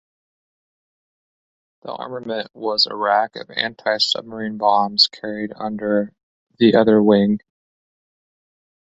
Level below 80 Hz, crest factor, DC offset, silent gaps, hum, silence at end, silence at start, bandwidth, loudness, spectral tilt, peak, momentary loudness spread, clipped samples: -62 dBFS; 20 dB; under 0.1%; 6.23-6.47 s; none; 1.45 s; 1.85 s; 8 kHz; -18 LUFS; -5 dB/octave; 0 dBFS; 15 LU; under 0.1%